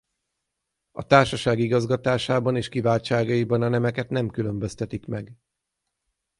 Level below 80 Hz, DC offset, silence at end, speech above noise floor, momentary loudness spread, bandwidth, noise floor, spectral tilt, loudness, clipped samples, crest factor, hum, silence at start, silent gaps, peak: -52 dBFS; under 0.1%; 1.05 s; 58 dB; 14 LU; 11.5 kHz; -81 dBFS; -6.5 dB/octave; -23 LUFS; under 0.1%; 22 dB; none; 0.95 s; none; -2 dBFS